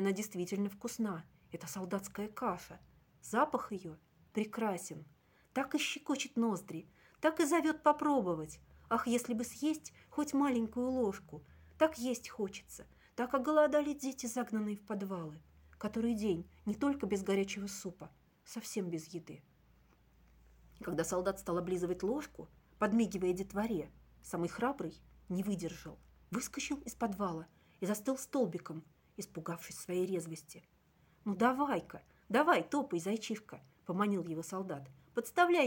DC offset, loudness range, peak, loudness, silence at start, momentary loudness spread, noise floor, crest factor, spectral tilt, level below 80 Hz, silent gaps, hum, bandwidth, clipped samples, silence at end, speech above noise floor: under 0.1%; 6 LU; -14 dBFS; -37 LUFS; 0 s; 18 LU; -69 dBFS; 24 dB; -5 dB/octave; -66 dBFS; none; none; 17 kHz; under 0.1%; 0 s; 33 dB